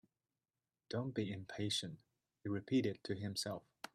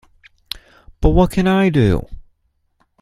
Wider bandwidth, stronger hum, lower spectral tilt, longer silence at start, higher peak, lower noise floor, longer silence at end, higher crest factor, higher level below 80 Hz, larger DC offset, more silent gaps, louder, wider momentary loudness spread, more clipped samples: first, 14.5 kHz vs 13 kHz; neither; second, -5 dB/octave vs -7.5 dB/octave; about the same, 0.9 s vs 1 s; second, -26 dBFS vs 0 dBFS; first, under -90 dBFS vs -64 dBFS; second, 0.1 s vs 0.8 s; about the same, 18 dB vs 18 dB; second, -78 dBFS vs -26 dBFS; neither; neither; second, -42 LUFS vs -16 LUFS; second, 12 LU vs 17 LU; neither